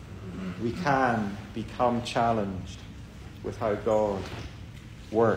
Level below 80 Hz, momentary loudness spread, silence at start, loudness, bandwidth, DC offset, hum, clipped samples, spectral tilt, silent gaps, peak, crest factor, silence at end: -48 dBFS; 19 LU; 0 s; -29 LUFS; 16 kHz; under 0.1%; none; under 0.1%; -6.5 dB/octave; none; -12 dBFS; 18 dB; 0 s